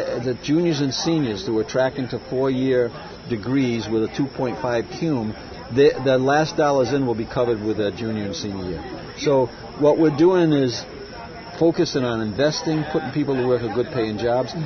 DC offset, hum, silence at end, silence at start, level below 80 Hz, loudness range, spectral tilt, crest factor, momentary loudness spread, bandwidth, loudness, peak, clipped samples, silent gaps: under 0.1%; none; 0 s; 0 s; -48 dBFS; 3 LU; -6 dB/octave; 16 dB; 11 LU; 6.6 kHz; -21 LUFS; -6 dBFS; under 0.1%; none